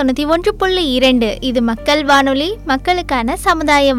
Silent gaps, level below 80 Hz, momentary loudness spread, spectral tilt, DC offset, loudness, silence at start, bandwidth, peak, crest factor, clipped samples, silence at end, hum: none; -32 dBFS; 5 LU; -4 dB/octave; under 0.1%; -14 LUFS; 0 s; 16.5 kHz; -4 dBFS; 10 dB; under 0.1%; 0 s; none